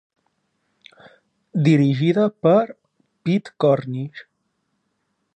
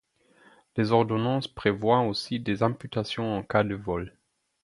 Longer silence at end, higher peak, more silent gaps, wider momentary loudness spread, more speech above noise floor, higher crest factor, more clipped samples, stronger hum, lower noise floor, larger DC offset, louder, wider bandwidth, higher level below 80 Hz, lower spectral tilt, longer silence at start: first, 1.15 s vs 0.55 s; about the same, -4 dBFS vs -6 dBFS; neither; first, 13 LU vs 9 LU; first, 54 dB vs 34 dB; about the same, 18 dB vs 22 dB; neither; neither; first, -72 dBFS vs -60 dBFS; neither; first, -20 LUFS vs -27 LUFS; second, 8.6 kHz vs 11.5 kHz; second, -68 dBFS vs -54 dBFS; first, -8.5 dB/octave vs -7 dB/octave; first, 1.55 s vs 0.75 s